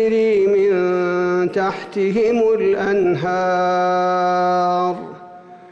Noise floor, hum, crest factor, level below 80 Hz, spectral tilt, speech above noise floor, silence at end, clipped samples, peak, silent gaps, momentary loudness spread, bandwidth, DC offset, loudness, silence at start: -39 dBFS; none; 8 dB; -56 dBFS; -7 dB/octave; 22 dB; 0.05 s; under 0.1%; -10 dBFS; none; 6 LU; 7.8 kHz; under 0.1%; -17 LUFS; 0 s